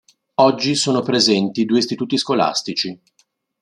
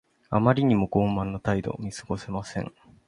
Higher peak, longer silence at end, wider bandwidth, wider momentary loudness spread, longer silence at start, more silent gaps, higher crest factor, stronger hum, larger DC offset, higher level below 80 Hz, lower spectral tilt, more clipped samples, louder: first, 0 dBFS vs -6 dBFS; first, 0.65 s vs 0.4 s; about the same, 12 kHz vs 11 kHz; second, 8 LU vs 13 LU; about the same, 0.4 s vs 0.3 s; neither; about the same, 18 dB vs 20 dB; neither; neither; second, -64 dBFS vs -48 dBFS; second, -4 dB/octave vs -7.5 dB/octave; neither; first, -18 LUFS vs -26 LUFS